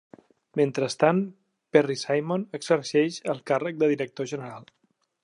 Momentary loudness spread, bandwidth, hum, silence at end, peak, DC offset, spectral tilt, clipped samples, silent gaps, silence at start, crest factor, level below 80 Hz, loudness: 11 LU; 11 kHz; none; 0.6 s; -4 dBFS; under 0.1%; -5.5 dB/octave; under 0.1%; none; 0.55 s; 22 dB; -78 dBFS; -26 LUFS